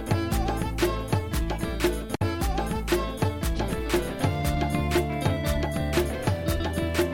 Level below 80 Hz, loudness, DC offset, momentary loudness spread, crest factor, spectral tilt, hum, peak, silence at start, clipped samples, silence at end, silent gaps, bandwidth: -32 dBFS; -27 LUFS; under 0.1%; 3 LU; 14 dB; -5.5 dB/octave; none; -12 dBFS; 0 s; under 0.1%; 0 s; none; 17 kHz